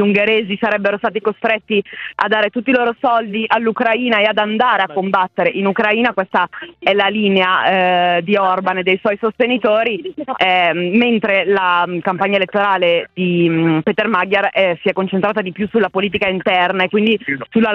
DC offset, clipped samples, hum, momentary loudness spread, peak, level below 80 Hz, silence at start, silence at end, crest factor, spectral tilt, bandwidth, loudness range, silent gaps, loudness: under 0.1%; under 0.1%; none; 5 LU; 0 dBFS; -58 dBFS; 0 s; 0 s; 14 dB; -7.5 dB/octave; 6.4 kHz; 1 LU; none; -15 LUFS